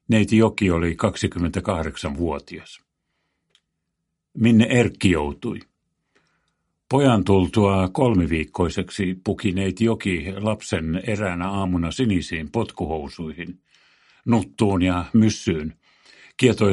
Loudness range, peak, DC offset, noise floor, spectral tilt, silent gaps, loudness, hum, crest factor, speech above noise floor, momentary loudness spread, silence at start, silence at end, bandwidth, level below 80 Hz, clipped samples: 5 LU; -2 dBFS; under 0.1%; -78 dBFS; -6.5 dB/octave; none; -21 LUFS; none; 20 dB; 57 dB; 14 LU; 0.1 s; 0 s; 11.5 kHz; -42 dBFS; under 0.1%